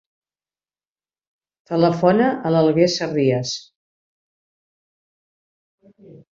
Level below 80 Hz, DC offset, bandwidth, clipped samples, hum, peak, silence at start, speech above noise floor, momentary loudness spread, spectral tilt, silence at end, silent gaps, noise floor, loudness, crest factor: -62 dBFS; under 0.1%; 7.6 kHz; under 0.1%; none; -2 dBFS; 1.7 s; over 72 dB; 10 LU; -6 dB/octave; 0.15 s; 3.75-5.78 s; under -90 dBFS; -18 LUFS; 20 dB